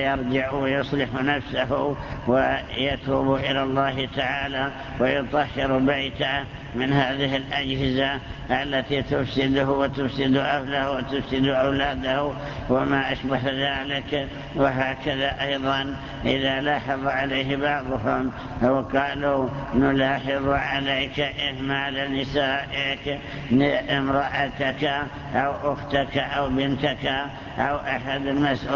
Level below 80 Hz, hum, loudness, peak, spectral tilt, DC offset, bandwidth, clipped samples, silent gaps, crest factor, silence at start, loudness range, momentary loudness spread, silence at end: -42 dBFS; none; -24 LUFS; -6 dBFS; -6.5 dB/octave; under 0.1%; 7.2 kHz; under 0.1%; none; 18 dB; 0 s; 1 LU; 5 LU; 0 s